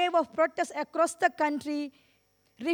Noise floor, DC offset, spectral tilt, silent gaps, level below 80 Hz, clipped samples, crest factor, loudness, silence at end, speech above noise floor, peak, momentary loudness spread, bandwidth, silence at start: -69 dBFS; under 0.1%; -2.5 dB/octave; none; -78 dBFS; under 0.1%; 18 dB; -29 LUFS; 0 s; 40 dB; -12 dBFS; 9 LU; 16.5 kHz; 0 s